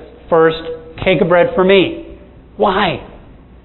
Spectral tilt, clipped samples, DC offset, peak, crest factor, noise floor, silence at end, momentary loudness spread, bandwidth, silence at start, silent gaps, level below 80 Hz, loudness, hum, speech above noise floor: -9.5 dB/octave; under 0.1%; under 0.1%; 0 dBFS; 14 dB; -39 dBFS; 0.5 s; 14 LU; 4.2 kHz; 0 s; none; -40 dBFS; -14 LUFS; none; 26 dB